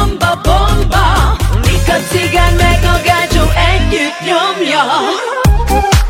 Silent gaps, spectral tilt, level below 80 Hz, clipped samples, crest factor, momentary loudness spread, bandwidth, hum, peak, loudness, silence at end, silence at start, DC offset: none; -4.5 dB/octave; -14 dBFS; under 0.1%; 10 dB; 3 LU; 16.5 kHz; none; 0 dBFS; -11 LUFS; 0 s; 0 s; under 0.1%